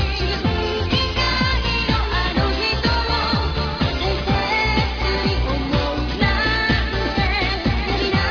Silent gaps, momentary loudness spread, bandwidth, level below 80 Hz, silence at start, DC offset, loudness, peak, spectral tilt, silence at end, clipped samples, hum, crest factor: none; 3 LU; 5.4 kHz; -26 dBFS; 0 s; under 0.1%; -20 LUFS; -4 dBFS; -5.5 dB/octave; 0 s; under 0.1%; none; 14 dB